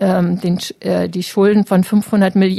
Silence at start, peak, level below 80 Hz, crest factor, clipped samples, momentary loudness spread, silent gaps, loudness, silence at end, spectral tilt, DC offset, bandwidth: 0 s; -2 dBFS; -54 dBFS; 12 dB; under 0.1%; 6 LU; none; -15 LUFS; 0 s; -7 dB/octave; under 0.1%; 13.5 kHz